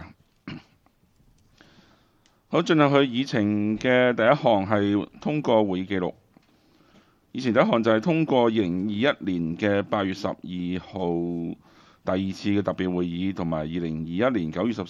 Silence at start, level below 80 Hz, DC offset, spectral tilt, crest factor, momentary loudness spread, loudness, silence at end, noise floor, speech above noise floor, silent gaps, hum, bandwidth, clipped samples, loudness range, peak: 0 s; -58 dBFS; under 0.1%; -7 dB/octave; 20 dB; 11 LU; -24 LUFS; 0 s; -62 dBFS; 39 dB; none; none; 7.6 kHz; under 0.1%; 6 LU; -4 dBFS